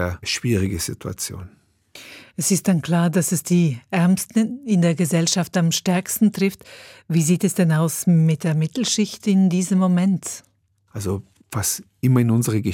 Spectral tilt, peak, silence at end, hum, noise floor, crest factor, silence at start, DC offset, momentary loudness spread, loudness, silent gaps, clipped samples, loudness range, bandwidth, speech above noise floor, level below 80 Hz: -5.5 dB/octave; -6 dBFS; 0 s; none; -45 dBFS; 16 dB; 0 s; under 0.1%; 11 LU; -20 LUFS; none; under 0.1%; 3 LU; 17.5 kHz; 25 dB; -56 dBFS